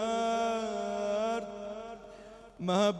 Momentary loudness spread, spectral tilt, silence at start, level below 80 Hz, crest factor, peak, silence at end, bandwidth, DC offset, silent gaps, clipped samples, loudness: 19 LU; -5 dB/octave; 0 s; -64 dBFS; 16 dB; -16 dBFS; 0 s; 12 kHz; under 0.1%; none; under 0.1%; -33 LUFS